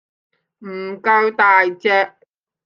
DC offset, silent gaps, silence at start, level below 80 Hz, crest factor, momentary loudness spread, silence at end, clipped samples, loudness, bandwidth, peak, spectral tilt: under 0.1%; none; 0.6 s; -78 dBFS; 16 dB; 16 LU; 0.55 s; under 0.1%; -15 LUFS; 7 kHz; -2 dBFS; -5.5 dB/octave